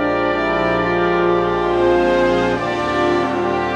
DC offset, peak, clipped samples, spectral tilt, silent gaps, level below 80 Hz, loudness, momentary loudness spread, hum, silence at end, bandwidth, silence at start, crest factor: under 0.1%; -4 dBFS; under 0.1%; -6.5 dB/octave; none; -38 dBFS; -17 LUFS; 4 LU; none; 0 s; 8.8 kHz; 0 s; 12 dB